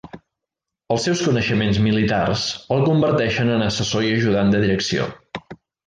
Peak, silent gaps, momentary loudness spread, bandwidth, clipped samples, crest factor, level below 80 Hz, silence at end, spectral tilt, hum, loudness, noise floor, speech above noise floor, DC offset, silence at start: -6 dBFS; none; 7 LU; 9.6 kHz; under 0.1%; 14 dB; -44 dBFS; 0.3 s; -5.5 dB/octave; none; -19 LUFS; -84 dBFS; 66 dB; under 0.1%; 0.05 s